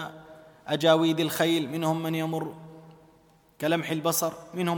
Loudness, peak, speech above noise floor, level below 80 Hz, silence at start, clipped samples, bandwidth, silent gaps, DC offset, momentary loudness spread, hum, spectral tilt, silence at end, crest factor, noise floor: -26 LUFS; -8 dBFS; 34 dB; -70 dBFS; 0 s; under 0.1%; 19 kHz; none; under 0.1%; 14 LU; none; -4.5 dB/octave; 0 s; 20 dB; -60 dBFS